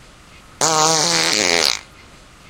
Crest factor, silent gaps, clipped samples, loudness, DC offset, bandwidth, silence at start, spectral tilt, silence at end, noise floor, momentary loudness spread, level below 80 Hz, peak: 20 dB; none; under 0.1%; -15 LUFS; under 0.1%; over 20 kHz; 0.6 s; -1 dB/octave; 0.65 s; -44 dBFS; 5 LU; -52 dBFS; 0 dBFS